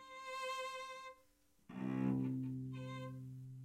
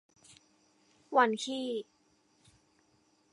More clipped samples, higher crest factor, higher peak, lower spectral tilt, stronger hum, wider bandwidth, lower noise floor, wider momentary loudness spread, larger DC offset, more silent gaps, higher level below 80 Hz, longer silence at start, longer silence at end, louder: neither; second, 16 dB vs 26 dB; second, -28 dBFS vs -12 dBFS; first, -6.5 dB/octave vs -3 dB/octave; neither; first, 15 kHz vs 11 kHz; about the same, -72 dBFS vs -70 dBFS; about the same, 14 LU vs 13 LU; neither; neither; first, -76 dBFS vs -84 dBFS; second, 0 s vs 1.1 s; second, 0 s vs 1.5 s; second, -44 LUFS vs -31 LUFS